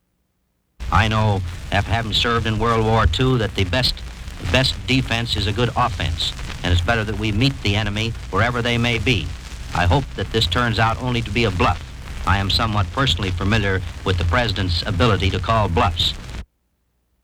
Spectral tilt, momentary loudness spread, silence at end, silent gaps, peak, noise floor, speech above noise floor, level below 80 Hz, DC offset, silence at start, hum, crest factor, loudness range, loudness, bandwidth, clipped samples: -5.5 dB/octave; 6 LU; 0.8 s; none; -2 dBFS; -68 dBFS; 49 dB; -30 dBFS; under 0.1%; 0.8 s; none; 18 dB; 1 LU; -19 LUFS; 14.5 kHz; under 0.1%